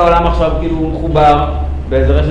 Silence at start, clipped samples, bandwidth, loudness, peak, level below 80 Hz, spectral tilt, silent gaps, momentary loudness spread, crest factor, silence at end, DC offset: 0 s; under 0.1%; 7.6 kHz; -13 LUFS; 0 dBFS; -18 dBFS; -8 dB/octave; none; 7 LU; 10 dB; 0 s; under 0.1%